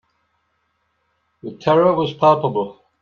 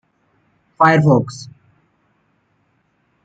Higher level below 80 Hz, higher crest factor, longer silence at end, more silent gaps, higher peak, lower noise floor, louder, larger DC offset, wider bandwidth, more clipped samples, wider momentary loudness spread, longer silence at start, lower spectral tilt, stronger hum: about the same, -62 dBFS vs -58 dBFS; about the same, 18 dB vs 18 dB; second, 0.3 s vs 1.8 s; neither; about the same, -2 dBFS vs -2 dBFS; first, -68 dBFS vs -63 dBFS; second, -17 LUFS vs -14 LUFS; neither; second, 7 kHz vs 8 kHz; neither; second, 18 LU vs 24 LU; first, 1.45 s vs 0.8 s; about the same, -8 dB/octave vs -7.5 dB/octave; neither